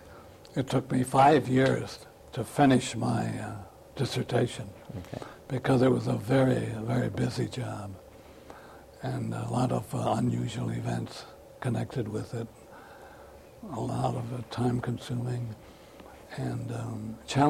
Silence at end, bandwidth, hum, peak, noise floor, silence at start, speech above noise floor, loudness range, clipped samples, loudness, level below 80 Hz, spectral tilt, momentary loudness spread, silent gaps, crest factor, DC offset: 0 s; 15 kHz; none; -10 dBFS; -50 dBFS; 0 s; 22 dB; 8 LU; under 0.1%; -29 LUFS; -56 dBFS; -6.5 dB/octave; 24 LU; none; 20 dB; under 0.1%